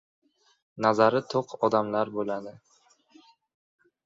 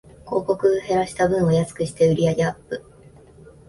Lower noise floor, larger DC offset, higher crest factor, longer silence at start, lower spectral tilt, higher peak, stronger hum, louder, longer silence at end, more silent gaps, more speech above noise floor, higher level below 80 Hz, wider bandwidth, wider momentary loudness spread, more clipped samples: first, -60 dBFS vs -48 dBFS; neither; first, 22 dB vs 16 dB; first, 0.75 s vs 0.25 s; about the same, -6 dB/octave vs -6.5 dB/octave; about the same, -6 dBFS vs -6 dBFS; neither; second, -26 LUFS vs -21 LUFS; first, 1.55 s vs 0.9 s; neither; first, 34 dB vs 27 dB; second, -72 dBFS vs -50 dBFS; second, 7.8 kHz vs 11.5 kHz; about the same, 11 LU vs 11 LU; neither